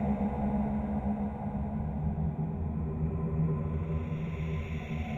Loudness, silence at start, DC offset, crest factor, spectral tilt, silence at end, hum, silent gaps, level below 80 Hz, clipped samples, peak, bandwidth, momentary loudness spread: -33 LUFS; 0 s; under 0.1%; 12 dB; -10 dB/octave; 0 s; none; none; -40 dBFS; under 0.1%; -20 dBFS; 7 kHz; 4 LU